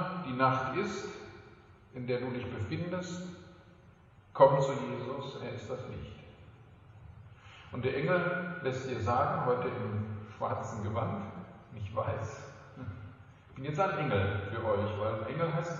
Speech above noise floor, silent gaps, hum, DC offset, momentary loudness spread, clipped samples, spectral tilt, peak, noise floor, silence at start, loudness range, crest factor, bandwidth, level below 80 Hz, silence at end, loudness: 26 dB; none; none; under 0.1%; 20 LU; under 0.1%; -7 dB/octave; -8 dBFS; -58 dBFS; 0 s; 7 LU; 26 dB; 7.8 kHz; -64 dBFS; 0 s; -33 LUFS